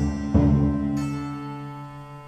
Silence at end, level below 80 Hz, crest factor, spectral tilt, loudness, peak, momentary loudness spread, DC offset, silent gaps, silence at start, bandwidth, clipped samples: 0 s; -34 dBFS; 18 dB; -8.5 dB/octave; -23 LUFS; -6 dBFS; 17 LU; under 0.1%; none; 0 s; 9.4 kHz; under 0.1%